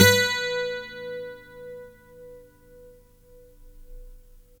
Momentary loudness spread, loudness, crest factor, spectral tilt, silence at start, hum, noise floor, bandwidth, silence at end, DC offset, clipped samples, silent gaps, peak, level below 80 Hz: 26 LU; -25 LUFS; 26 dB; -3 dB/octave; 0 s; none; -52 dBFS; over 20 kHz; 0.4 s; under 0.1%; under 0.1%; none; 0 dBFS; -50 dBFS